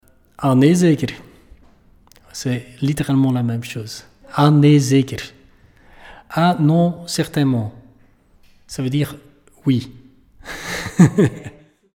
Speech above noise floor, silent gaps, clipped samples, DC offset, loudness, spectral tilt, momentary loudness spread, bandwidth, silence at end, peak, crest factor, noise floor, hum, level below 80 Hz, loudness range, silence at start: 36 dB; none; under 0.1%; under 0.1%; -18 LUFS; -6.5 dB/octave; 20 LU; 16 kHz; 0.5 s; 0 dBFS; 18 dB; -52 dBFS; none; -50 dBFS; 6 LU; 0.4 s